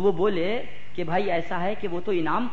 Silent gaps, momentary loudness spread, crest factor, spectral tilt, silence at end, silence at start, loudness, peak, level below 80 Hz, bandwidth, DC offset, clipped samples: none; 8 LU; 16 dB; -7.5 dB/octave; 0 s; 0 s; -27 LUFS; -10 dBFS; -54 dBFS; 7.4 kHz; 5%; under 0.1%